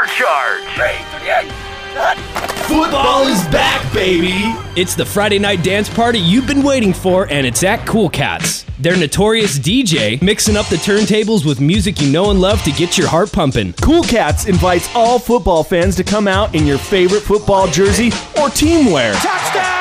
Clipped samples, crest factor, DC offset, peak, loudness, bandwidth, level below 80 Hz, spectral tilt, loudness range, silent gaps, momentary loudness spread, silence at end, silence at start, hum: under 0.1%; 10 dB; under 0.1%; -2 dBFS; -13 LUFS; 16 kHz; -28 dBFS; -4.5 dB/octave; 2 LU; none; 5 LU; 0 s; 0 s; none